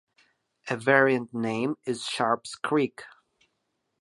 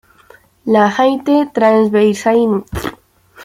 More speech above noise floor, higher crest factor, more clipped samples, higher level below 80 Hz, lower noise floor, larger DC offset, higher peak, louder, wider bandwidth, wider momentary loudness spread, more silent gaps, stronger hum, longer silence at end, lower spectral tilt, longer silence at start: first, 52 dB vs 34 dB; first, 24 dB vs 12 dB; neither; second, -76 dBFS vs -42 dBFS; first, -78 dBFS vs -46 dBFS; neither; second, -6 dBFS vs -2 dBFS; second, -26 LUFS vs -13 LUFS; second, 11.5 kHz vs 15.5 kHz; about the same, 12 LU vs 13 LU; neither; neither; first, 0.95 s vs 0 s; about the same, -5 dB/octave vs -6 dB/octave; about the same, 0.65 s vs 0.65 s